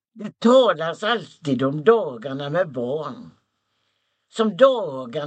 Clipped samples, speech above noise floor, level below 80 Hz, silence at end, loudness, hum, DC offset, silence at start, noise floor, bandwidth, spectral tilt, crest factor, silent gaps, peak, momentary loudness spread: under 0.1%; 52 dB; -72 dBFS; 0 s; -20 LUFS; none; under 0.1%; 0.15 s; -72 dBFS; 8.8 kHz; -6 dB/octave; 20 dB; none; -2 dBFS; 14 LU